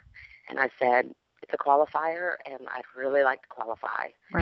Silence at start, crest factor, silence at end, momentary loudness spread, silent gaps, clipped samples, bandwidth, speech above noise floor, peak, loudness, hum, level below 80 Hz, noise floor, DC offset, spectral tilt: 0.15 s; 20 dB; 0 s; 14 LU; none; under 0.1%; 5.8 kHz; 23 dB; -8 dBFS; -28 LUFS; none; -72 dBFS; -51 dBFS; under 0.1%; -8.5 dB/octave